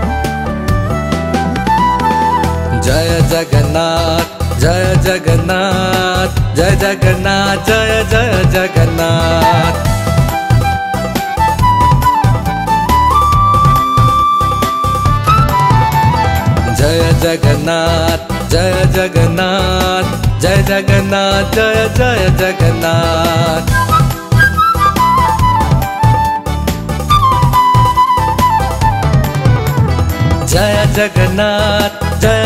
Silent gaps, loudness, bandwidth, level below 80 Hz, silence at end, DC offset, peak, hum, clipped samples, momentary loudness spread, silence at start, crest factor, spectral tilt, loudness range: none; -11 LUFS; 16.5 kHz; -22 dBFS; 0 s; 0.1%; 0 dBFS; none; under 0.1%; 5 LU; 0 s; 10 dB; -5.5 dB/octave; 2 LU